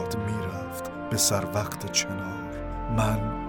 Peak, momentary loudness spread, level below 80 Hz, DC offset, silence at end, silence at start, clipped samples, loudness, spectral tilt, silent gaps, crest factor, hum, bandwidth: -8 dBFS; 12 LU; -40 dBFS; under 0.1%; 0 s; 0 s; under 0.1%; -28 LUFS; -4 dB/octave; none; 20 dB; none; 19 kHz